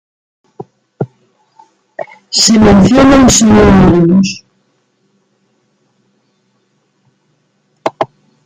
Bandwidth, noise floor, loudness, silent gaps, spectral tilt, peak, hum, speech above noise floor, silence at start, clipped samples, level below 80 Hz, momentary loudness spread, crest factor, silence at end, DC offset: 14.5 kHz; -59 dBFS; -7 LUFS; none; -5 dB/octave; 0 dBFS; none; 53 dB; 0.6 s; under 0.1%; -30 dBFS; 22 LU; 12 dB; 0.4 s; under 0.1%